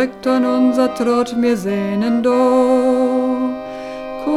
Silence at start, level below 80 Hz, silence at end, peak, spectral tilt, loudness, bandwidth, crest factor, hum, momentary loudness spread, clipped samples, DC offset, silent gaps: 0 s; -52 dBFS; 0 s; -2 dBFS; -6 dB/octave; -16 LUFS; 12.5 kHz; 14 dB; none; 11 LU; under 0.1%; under 0.1%; none